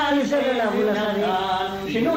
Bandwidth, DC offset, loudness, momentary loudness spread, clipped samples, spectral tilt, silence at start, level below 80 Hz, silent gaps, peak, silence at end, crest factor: 16 kHz; under 0.1%; -22 LUFS; 4 LU; under 0.1%; -5 dB/octave; 0 s; -52 dBFS; none; -10 dBFS; 0 s; 12 dB